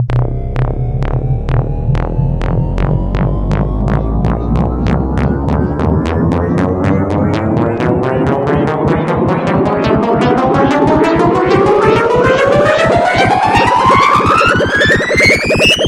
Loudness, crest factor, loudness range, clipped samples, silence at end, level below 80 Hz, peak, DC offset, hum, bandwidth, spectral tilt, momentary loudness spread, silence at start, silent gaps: -12 LUFS; 12 dB; 6 LU; under 0.1%; 0 s; -22 dBFS; 0 dBFS; 0.1%; none; 15.5 kHz; -6 dB/octave; 7 LU; 0 s; none